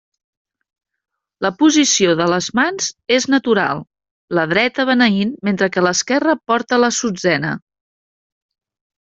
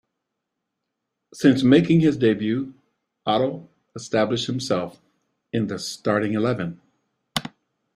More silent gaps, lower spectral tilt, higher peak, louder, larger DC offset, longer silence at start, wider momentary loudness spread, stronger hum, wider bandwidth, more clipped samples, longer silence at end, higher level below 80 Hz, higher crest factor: first, 4.11-4.28 s vs none; second, -3.5 dB/octave vs -6 dB/octave; about the same, -2 dBFS vs -2 dBFS; first, -16 LUFS vs -22 LUFS; neither; about the same, 1.4 s vs 1.35 s; second, 9 LU vs 17 LU; neither; second, 8 kHz vs 14 kHz; neither; first, 1.6 s vs 0.45 s; about the same, -60 dBFS vs -58 dBFS; about the same, 16 dB vs 20 dB